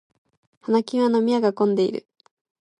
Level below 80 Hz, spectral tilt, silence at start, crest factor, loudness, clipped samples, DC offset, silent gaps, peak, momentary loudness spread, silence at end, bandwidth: -74 dBFS; -7 dB/octave; 0.7 s; 14 dB; -21 LUFS; under 0.1%; under 0.1%; none; -8 dBFS; 10 LU; 0.8 s; 10.5 kHz